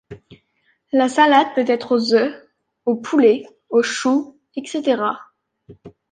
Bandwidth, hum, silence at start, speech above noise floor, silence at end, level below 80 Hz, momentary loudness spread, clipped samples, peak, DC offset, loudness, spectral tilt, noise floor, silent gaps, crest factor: 9.6 kHz; none; 0.1 s; 47 dB; 0.2 s; -64 dBFS; 12 LU; under 0.1%; -2 dBFS; under 0.1%; -18 LUFS; -4 dB/octave; -65 dBFS; none; 18 dB